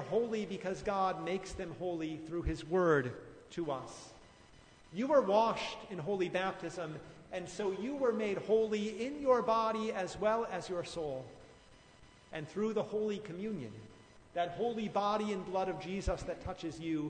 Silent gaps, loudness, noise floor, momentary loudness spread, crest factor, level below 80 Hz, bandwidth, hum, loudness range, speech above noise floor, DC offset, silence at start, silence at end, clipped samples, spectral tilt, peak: none; -36 LUFS; -60 dBFS; 14 LU; 20 dB; -56 dBFS; 9.6 kHz; none; 6 LU; 25 dB; under 0.1%; 0 s; 0 s; under 0.1%; -5.5 dB/octave; -16 dBFS